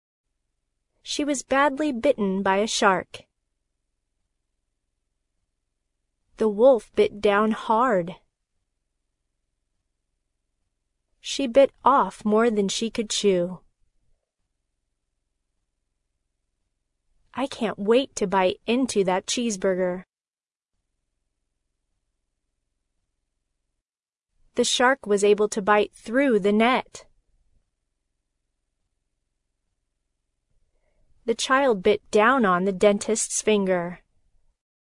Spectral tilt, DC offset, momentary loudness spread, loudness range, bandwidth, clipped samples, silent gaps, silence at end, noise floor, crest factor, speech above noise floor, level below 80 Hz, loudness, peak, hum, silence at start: -4 dB/octave; under 0.1%; 9 LU; 10 LU; 11 kHz; under 0.1%; 20.30-20.34 s; 0.85 s; under -90 dBFS; 22 dB; over 68 dB; -60 dBFS; -22 LUFS; -4 dBFS; none; 1.05 s